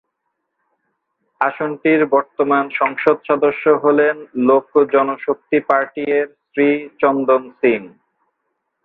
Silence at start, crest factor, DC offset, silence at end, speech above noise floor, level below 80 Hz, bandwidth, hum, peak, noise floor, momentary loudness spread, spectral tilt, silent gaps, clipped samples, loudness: 1.4 s; 18 dB; under 0.1%; 0.95 s; 58 dB; -66 dBFS; 4.2 kHz; none; 0 dBFS; -74 dBFS; 6 LU; -8.5 dB/octave; none; under 0.1%; -17 LUFS